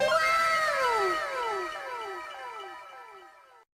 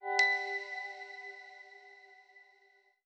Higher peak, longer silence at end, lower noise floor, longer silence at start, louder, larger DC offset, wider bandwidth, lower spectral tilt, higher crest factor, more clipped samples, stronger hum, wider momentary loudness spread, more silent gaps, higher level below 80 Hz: about the same, -14 dBFS vs -16 dBFS; second, 0.45 s vs 0.65 s; second, -53 dBFS vs -68 dBFS; about the same, 0 s vs 0 s; first, -27 LUFS vs -33 LUFS; neither; first, 15.5 kHz vs 10 kHz; first, -1.5 dB/octave vs 3 dB/octave; second, 16 dB vs 22 dB; neither; neither; second, 21 LU vs 26 LU; neither; first, -64 dBFS vs under -90 dBFS